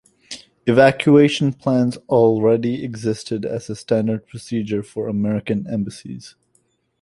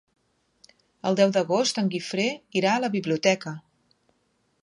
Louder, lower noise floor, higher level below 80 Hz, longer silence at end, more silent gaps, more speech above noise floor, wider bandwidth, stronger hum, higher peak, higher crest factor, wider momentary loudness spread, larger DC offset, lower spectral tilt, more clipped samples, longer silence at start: first, -19 LUFS vs -24 LUFS; second, -64 dBFS vs -70 dBFS; first, -56 dBFS vs -76 dBFS; second, 0.7 s vs 1 s; neither; about the same, 46 dB vs 46 dB; about the same, 11.5 kHz vs 11 kHz; neither; first, -2 dBFS vs -6 dBFS; about the same, 18 dB vs 22 dB; first, 15 LU vs 8 LU; neither; first, -6.5 dB/octave vs -4.5 dB/octave; neither; second, 0.3 s vs 1.05 s